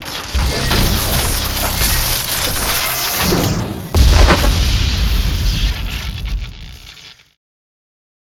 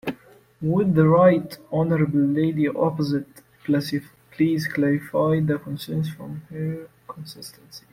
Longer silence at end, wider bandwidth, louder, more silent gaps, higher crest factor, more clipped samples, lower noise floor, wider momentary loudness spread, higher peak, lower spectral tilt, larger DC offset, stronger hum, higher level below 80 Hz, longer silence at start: first, 1.2 s vs 0.15 s; first, 20 kHz vs 16 kHz; first, -16 LUFS vs -22 LUFS; neither; about the same, 16 dB vs 18 dB; neither; second, -39 dBFS vs -49 dBFS; second, 13 LU vs 20 LU; first, 0 dBFS vs -4 dBFS; second, -3.5 dB/octave vs -8 dB/octave; neither; neither; first, -18 dBFS vs -58 dBFS; about the same, 0 s vs 0.05 s